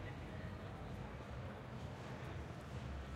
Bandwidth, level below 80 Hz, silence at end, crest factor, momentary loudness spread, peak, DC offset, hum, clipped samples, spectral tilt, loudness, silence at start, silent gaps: 15.5 kHz; -56 dBFS; 0 s; 12 dB; 1 LU; -36 dBFS; under 0.1%; none; under 0.1%; -6.5 dB/octave; -49 LUFS; 0 s; none